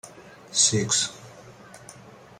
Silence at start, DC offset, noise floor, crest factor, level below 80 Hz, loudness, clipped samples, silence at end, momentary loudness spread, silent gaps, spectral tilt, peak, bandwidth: 0.05 s; under 0.1%; -47 dBFS; 24 dB; -64 dBFS; -22 LUFS; under 0.1%; 0.3 s; 25 LU; none; -2 dB/octave; -4 dBFS; 15 kHz